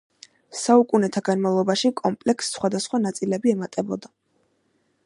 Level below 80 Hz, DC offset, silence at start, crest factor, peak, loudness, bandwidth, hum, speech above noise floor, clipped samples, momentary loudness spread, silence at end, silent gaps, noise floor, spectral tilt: -70 dBFS; under 0.1%; 0.5 s; 20 dB; -4 dBFS; -22 LUFS; 11.5 kHz; none; 46 dB; under 0.1%; 10 LU; 1 s; none; -68 dBFS; -5 dB/octave